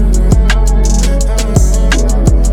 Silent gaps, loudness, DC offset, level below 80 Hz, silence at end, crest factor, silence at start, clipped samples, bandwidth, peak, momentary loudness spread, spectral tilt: none; -12 LUFS; under 0.1%; -10 dBFS; 0 s; 8 dB; 0 s; under 0.1%; 12.5 kHz; 0 dBFS; 2 LU; -5 dB/octave